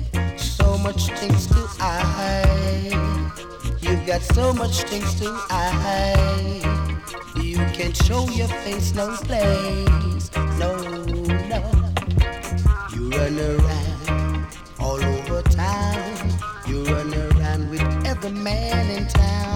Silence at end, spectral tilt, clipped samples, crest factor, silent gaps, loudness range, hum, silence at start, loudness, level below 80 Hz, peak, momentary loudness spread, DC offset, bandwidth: 0 s; -5.5 dB/octave; under 0.1%; 14 dB; none; 2 LU; none; 0 s; -22 LUFS; -24 dBFS; -6 dBFS; 6 LU; under 0.1%; 17 kHz